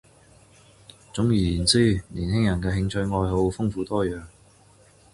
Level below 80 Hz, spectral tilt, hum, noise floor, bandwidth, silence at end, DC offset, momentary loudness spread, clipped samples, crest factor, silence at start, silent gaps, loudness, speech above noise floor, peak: -40 dBFS; -5.5 dB/octave; none; -55 dBFS; 11.5 kHz; 0.85 s; under 0.1%; 8 LU; under 0.1%; 20 dB; 1.15 s; none; -24 LUFS; 32 dB; -4 dBFS